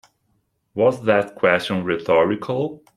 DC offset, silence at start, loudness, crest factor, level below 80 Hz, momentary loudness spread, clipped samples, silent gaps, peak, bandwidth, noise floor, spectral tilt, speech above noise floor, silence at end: under 0.1%; 0.75 s; -20 LUFS; 18 dB; -60 dBFS; 7 LU; under 0.1%; none; -2 dBFS; 12.5 kHz; -68 dBFS; -6.5 dB/octave; 49 dB; 0.2 s